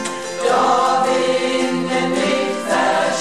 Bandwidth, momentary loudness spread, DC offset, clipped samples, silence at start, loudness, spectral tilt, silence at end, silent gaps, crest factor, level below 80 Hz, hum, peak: 13.5 kHz; 4 LU; 0.6%; under 0.1%; 0 s; -17 LUFS; -3.5 dB/octave; 0 s; none; 14 dB; -60 dBFS; none; -4 dBFS